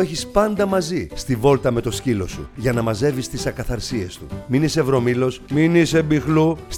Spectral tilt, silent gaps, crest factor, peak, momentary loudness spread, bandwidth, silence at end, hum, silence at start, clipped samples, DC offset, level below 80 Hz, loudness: -6 dB/octave; none; 16 dB; -2 dBFS; 9 LU; 17.5 kHz; 0 s; none; 0 s; under 0.1%; under 0.1%; -38 dBFS; -20 LUFS